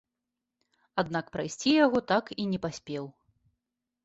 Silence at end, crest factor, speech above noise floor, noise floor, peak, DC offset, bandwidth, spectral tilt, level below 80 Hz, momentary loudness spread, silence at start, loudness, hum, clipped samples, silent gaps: 0.95 s; 20 dB; 58 dB; -87 dBFS; -12 dBFS; under 0.1%; 8.2 kHz; -5 dB/octave; -64 dBFS; 14 LU; 0.95 s; -29 LUFS; none; under 0.1%; none